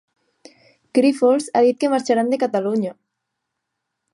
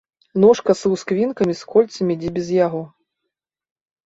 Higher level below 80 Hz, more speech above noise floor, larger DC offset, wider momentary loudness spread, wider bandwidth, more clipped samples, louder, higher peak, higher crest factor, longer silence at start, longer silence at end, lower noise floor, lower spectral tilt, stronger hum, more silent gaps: second, -76 dBFS vs -56 dBFS; about the same, 61 dB vs 63 dB; neither; second, 7 LU vs 10 LU; first, 11.5 kHz vs 8 kHz; neither; about the same, -19 LUFS vs -18 LUFS; about the same, -4 dBFS vs -2 dBFS; about the same, 16 dB vs 18 dB; first, 0.95 s vs 0.35 s; about the same, 1.2 s vs 1.2 s; about the same, -79 dBFS vs -81 dBFS; about the same, -5.5 dB/octave vs -6.5 dB/octave; neither; neither